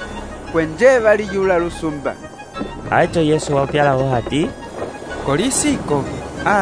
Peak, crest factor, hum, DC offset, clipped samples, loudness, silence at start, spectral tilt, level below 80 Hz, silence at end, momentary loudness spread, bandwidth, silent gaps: 0 dBFS; 18 dB; none; 0.2%; under 0.1%; -17 LUFS; 0 s; -5 dB/octave; -38 dBFS; 0 s; 14 LU; 11 kHz; none